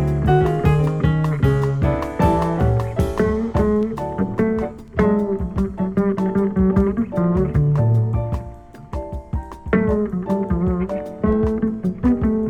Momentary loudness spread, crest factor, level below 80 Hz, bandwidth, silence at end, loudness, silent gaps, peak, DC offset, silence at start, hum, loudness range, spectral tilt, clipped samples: 8 LU; 16 dB; -30 dBFS; 13 kHz; 0 s; -20 LUFS; none; -2 dBFS; under 0.1%; 0 s; none; 3 LU; -9.5 dB/octave; under 0.1%